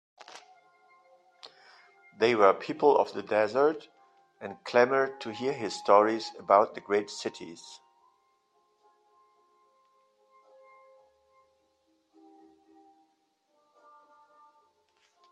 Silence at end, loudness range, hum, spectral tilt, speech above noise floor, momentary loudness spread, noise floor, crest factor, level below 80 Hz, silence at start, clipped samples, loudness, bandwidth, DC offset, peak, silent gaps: 7.55 s; 5 LU; none; -4.5 dB/octave; 47 dB; 22 LU; -73 dBFS; 26 dB; -80 dBFS; 0.35 s; under 0.1%; -26 LUFS; 9.4 kHz; under 0.1%; -6 dBFS; none